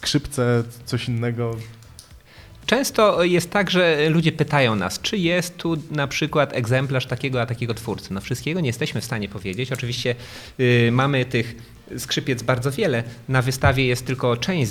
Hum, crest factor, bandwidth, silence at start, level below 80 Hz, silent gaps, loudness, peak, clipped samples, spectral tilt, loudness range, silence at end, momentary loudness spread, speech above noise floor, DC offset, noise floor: none; 20 dB; 16.5 kHz; 0 s; -46 dBFS; none; -22 LUFS; -2 dBFS; under 0.1%; -5 dB/octave; 5 LU; 0 s; 11 LU; 24 dB; under 0.1%; -45 dBFS